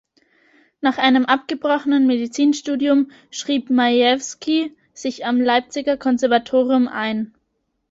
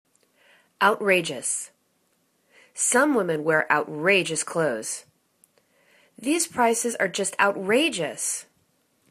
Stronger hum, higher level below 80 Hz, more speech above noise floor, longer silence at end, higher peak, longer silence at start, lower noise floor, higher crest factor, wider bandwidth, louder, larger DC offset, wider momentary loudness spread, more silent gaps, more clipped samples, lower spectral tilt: neither; first, -64 dBFS vs -74 dBFS; first, 53 dB vs 45 dB; about the same, 0.65 s vs 0.7 s; about the same, -2 dBFS vs -4 dBFS; about the same, 0.8 s vs 0.8 s; about the same, -72 dBFS vs -69 dBFS; second, 16 dB vs 22 dB; second, 7.8 kHz vs 14 kHz; first, -19 LUFS vs -23 LUFS; neither; about the same, 10 LU vs 10 LU; neither; neither; about the same, -3.5 dB/octave vs -2.5 dB/octave